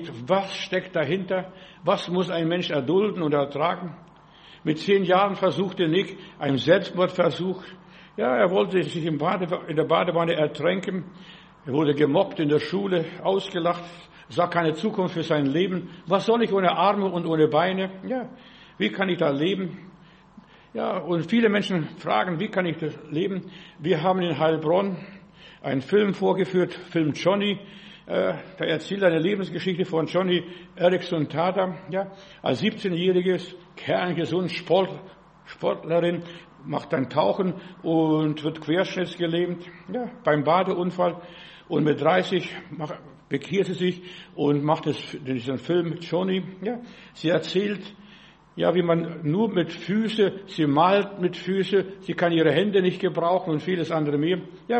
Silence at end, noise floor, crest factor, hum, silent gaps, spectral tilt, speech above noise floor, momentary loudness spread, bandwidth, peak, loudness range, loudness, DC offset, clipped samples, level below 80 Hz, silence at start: 0 s; -51 dBFS; 20 dB; none; none; -7 dB/octave; 27 dB; 11 LU; 8.4 kHz; -4 dBFS; 3 LU; -24 LUFS; under 0.1%; under 0.1%; -64 dBFS; 0 s